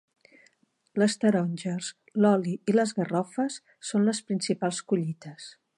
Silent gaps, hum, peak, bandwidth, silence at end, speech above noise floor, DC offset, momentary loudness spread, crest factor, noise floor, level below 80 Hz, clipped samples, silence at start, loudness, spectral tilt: none; none; -10 dBFS; 11.5 kHz; 0.3 s; 40 dB; under 0.1%; 12 LU; 18 dB; -67 dBFS; -78 dBFS; under 0.1%; 0.95 s; -27 LUFS; -5.5 dB/octave